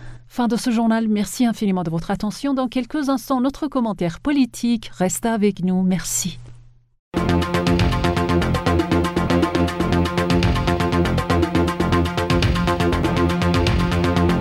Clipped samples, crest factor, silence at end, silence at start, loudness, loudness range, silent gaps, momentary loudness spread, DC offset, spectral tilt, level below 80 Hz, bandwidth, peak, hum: under 0.1%; 14 dB; 0 s; 0 s; -20 LUFS; 3 LU; 6.99-7.12 s; 5 LU; under 0.1%; -5.5 dB/octave; -30 dBFS; 16 kHz; -6 dBFS; none